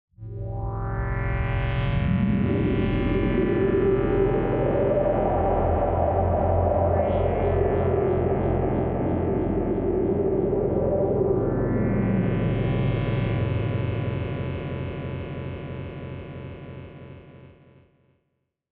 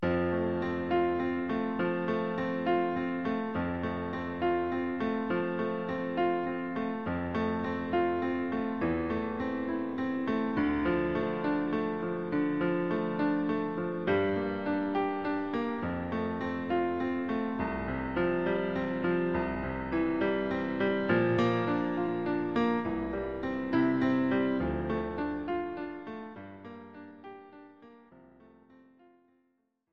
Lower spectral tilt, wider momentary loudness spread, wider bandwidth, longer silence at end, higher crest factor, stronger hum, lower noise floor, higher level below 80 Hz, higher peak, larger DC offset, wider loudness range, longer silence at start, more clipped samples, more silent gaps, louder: about the same, -8 dB/octave vs -8.5 dB/octave; first, 12 LU vs 6 LU; second, 4.3 kHz vs 6.6 kHz; first, 1.25 s vs 0.75 s; about the same, 14 dB vs 16 dB; neither; about the same, -76 dBFS vs -76 dBFS; first, -34 dBFS vs -54 dBFS; first, -10 dBFS vs -14 dBFS; second, under 0.1% vs 0.2%; first, 11 LU vs 3 LU; first, 0.2 s vs 0 s; neither; neither; first, -24 LUFS vs -31 LUFS